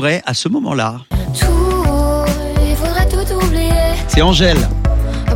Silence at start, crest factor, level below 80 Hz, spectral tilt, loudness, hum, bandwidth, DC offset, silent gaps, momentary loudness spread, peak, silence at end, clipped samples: 0 s; 14 dB; -16 dBFS; -5 dB/octave; -15 LUFS; none; 17 kHz; under 0.1%; none; 6 LU; 0 dBFS; 0 s; under 0.1%